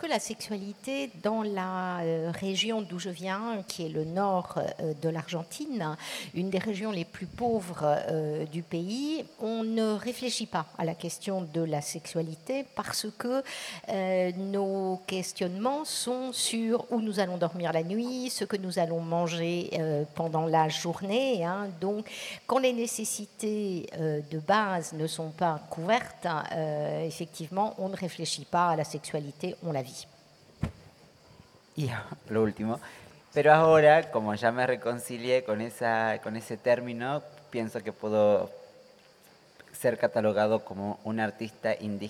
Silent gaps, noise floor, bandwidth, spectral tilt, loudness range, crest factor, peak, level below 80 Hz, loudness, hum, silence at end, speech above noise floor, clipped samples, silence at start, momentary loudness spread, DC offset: none; -58 dBFS; 16.5 kHz; -4.5 dB/octave; 8 LU; 24 dB; -6 dBFS; -66 dBFS; -30 LUFS; none; 0 s; 28 dB; under 0.1%; 0 s; 9 LU; under 0.1%